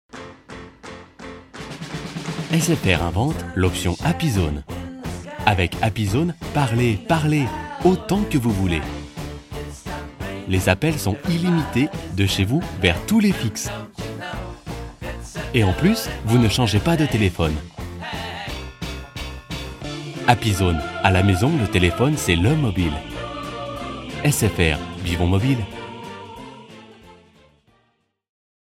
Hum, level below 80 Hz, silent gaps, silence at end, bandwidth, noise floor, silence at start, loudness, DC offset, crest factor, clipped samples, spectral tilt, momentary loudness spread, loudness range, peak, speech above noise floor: none; -36 dBFS; none; 1.6 s; 16.5 kHz; -67 dBFS; 0.15 s; -21 LUFS; under 0.1%; 22 dB; under 0.1%; -5.5 dB/octave; 16 LU; 5 LU; 0 dBFS; 48 dB